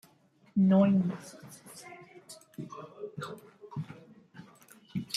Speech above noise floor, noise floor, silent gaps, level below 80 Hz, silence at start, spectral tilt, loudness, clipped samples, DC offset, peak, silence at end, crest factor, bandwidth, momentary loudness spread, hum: 36 dB; -64 dBFS; none; -74 dBFS; 0.55 s; -7 dB/octave; -29 LUFS; under 0.1%; under 0.1%; -14 dBFS; 0 s; 20 dB; 13 kHz; 27 LU; none